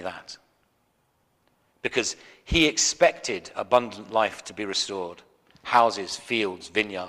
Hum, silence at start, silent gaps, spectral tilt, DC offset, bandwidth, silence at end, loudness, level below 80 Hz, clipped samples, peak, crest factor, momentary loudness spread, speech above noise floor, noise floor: none; 0 s; none; -2.5 dB/octave; under 0.1%; 15.5 kHz; 0 s; -25 LUFS; -48 dBFS; under 0.1%; -4 dBFS; 22 dB; 17 LU; 44 dB; -69 dBFS